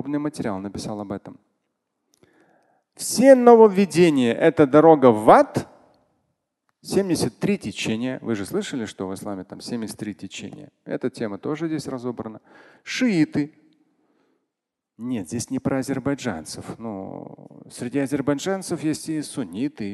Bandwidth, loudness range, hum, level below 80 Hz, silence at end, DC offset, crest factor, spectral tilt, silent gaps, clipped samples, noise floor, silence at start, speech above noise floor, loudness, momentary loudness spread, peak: 12.5 kHz; 15 LU; none; -58 dBFS; 0 s; under 0.1%; 22 dB; -5.5 dB/octave; none; under 0.1%; -84 dBFS; 0 s; 63 dB; -21 LUFS; 21 LU; 0 dBFS